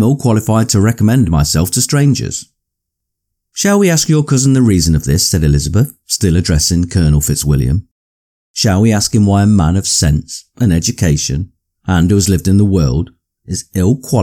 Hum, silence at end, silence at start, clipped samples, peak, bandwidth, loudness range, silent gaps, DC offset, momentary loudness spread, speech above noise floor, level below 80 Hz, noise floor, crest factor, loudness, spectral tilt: none; 0 s; 0 s; under 0.1%; -2 dBFS; 18 kHz; 2 LU; 7.91-8.54 s; under 0.1%; 9 LU; 64 dB; -26 dBFS; -76 dBFS; 10 dB; -12 LUFS; -5 dB/octave